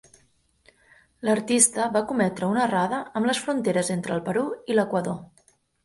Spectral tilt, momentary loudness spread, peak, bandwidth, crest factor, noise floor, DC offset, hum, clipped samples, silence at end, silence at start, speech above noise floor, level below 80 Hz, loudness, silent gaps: -4 dB/octave; 9 LU; -4 dBFS; 12 kHz; 22 dB; -64 dBFS; under 0.1%; none; under 0.1%; 0.6 s; 1.2 s; 40 dB; -64 dBFS; -24 LUFS; none